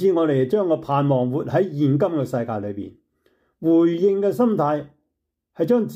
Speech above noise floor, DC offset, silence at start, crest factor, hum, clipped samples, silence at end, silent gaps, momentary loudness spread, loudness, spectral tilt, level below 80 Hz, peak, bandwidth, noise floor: 58 dB; under 0.1%; 0 s; 14 dB; none; under 0.1%; 0 s; none; 9 LU; -21 LUFS; -9 dB/octave; -64 dBFS; -8 dBFS; 15 kHz; -78 dBFS